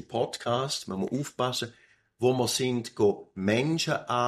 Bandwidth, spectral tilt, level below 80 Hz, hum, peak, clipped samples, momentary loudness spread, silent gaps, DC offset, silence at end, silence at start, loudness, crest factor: 15 kHz; -4.5 dB/octave; -66 dBFS; none; -10 dBFS; under 0.1%; 6 LU; none; under 0.1%; 0 s; 0 s; -28 LUFS; 18 dB